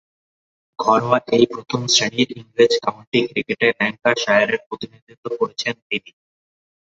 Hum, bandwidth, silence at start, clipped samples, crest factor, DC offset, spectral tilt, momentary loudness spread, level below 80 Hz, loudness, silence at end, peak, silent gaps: none; 8 kHz; 0.8 s; under 0.1%; 20 dB; under 0.1%; -3.5 dB/octave; 10 LU; -62 dBFS; -19 LUFS; 0.85 s; -2 dBFS; 3.07-3.12 s, 4.66-4.71 s, 5.02-5.07 s, 5.17-5.23 s, 5.82-5.90 s